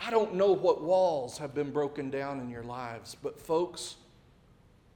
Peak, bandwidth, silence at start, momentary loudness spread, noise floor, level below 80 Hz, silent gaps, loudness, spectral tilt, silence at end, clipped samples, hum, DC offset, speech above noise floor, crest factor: -14 dBFS; 17.5 kHz; 0 s; 14 LU; -60 dBFS; -64 dBFS; none; -31 LUFS; -5.5 dB/octave; 1 s; under 0.1%; none; under 0.1%; 30 dB; 18 dB